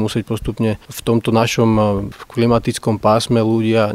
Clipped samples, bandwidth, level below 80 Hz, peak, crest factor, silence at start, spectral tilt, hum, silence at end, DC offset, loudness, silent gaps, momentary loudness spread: under 0.1%; 15.5 kHz; -38 dBFS; 0 dBFS; 16 dB; 0 s; -6 dB/octave; none; 0 s; under 0.1%; -17 LUFS; none; 8 LU